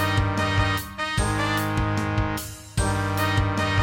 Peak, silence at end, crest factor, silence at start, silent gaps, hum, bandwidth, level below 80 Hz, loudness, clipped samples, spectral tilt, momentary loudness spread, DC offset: -8 dBFS; 0 s; 16 dB; 0 s; none; none; 17 kHz; -34 dBFS; -24 LUFS; under 0.1%; -5 dB/octave; 4 LU; under 0.1%